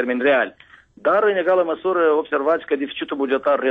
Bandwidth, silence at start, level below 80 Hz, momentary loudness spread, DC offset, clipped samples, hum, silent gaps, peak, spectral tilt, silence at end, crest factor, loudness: 4.7 kHz; 0 s; -64 dBFS; 7 LU; under 0.1%; under 0.1%; none; none; -8 dBFS; -7 dB/octave; 0 s; 12 dB; -20 LUFS